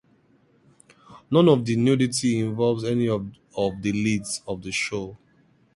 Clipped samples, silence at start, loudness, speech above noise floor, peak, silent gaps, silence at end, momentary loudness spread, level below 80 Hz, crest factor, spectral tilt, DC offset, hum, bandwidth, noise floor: under 0.1%; 1.1 s; -23 LUFS; 38 dB; -4 dBFS; none; 0.6 s; 11 LU; -56 dBFS; 20 dB; -5.5 dB/octave; under 0.1%; none; 11.5 kHz; -61 dBFS